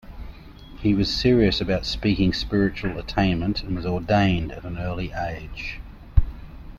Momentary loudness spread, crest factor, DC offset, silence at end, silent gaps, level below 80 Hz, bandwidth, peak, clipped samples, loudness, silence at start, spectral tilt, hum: 14 LU; 20 dB; under 0.1%; 0 s; none; -32 dBFS; 12.5 kHz; -2 dBFS; under 0.1%; -24 LUFS; 0.05 s; -6.5 dB/octave; none